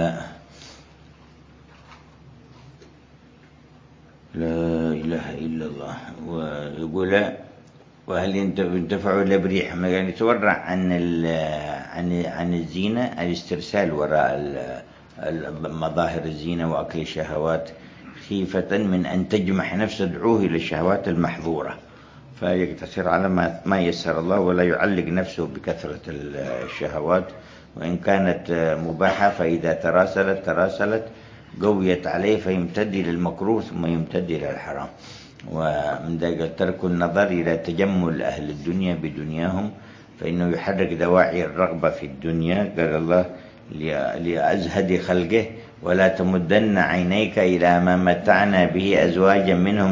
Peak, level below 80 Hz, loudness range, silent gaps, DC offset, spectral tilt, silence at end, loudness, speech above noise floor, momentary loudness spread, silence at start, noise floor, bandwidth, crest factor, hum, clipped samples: -2 dBFS; -46 dBFS; 6 LU; none; under 0.1%; -7 dB/octave; 0 s; -22 LUFS; 28 dB; 12 LU; 0 s; -50 dBFS; 7.6 kHz; 20 dB; none; under 0.1%